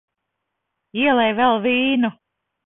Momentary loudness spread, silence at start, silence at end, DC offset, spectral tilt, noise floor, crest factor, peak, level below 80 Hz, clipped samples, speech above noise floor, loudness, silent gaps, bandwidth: 7 LU; 0.95 s; 0.55 s; under 0.1%; -9.5 dB/octave; -78 dBFS; 16 dB; -4 dBFS; -60 dBFS; under 0.1%; 61 dB; -18 LUFS; none; 4 kHz